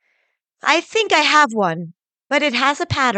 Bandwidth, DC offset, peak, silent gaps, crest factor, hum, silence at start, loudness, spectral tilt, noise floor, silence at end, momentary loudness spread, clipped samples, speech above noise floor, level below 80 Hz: 9.4 kHz; under 0.1%; -2 dBFS; none; 16 dB; none; 0.65 s; -16 LUFS; -3 dB/octave; -68 dBFS; 0 s; 10 LU; under 0.1%; 51 dB; -54 dBFS